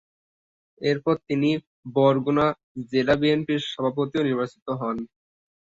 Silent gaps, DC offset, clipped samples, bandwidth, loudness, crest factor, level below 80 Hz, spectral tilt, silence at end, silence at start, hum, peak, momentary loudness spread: 1.67-1.83 s, 2.63-2.75 s, 4.62-4.66 s; under 0.1%; under 0.1%; 7.8 kHz; -24 LUFS; 18 dB; -58 dBFS; -7 dB/octave; 0.55 s; 0.8 s; none; -6 dBFS; 9 LU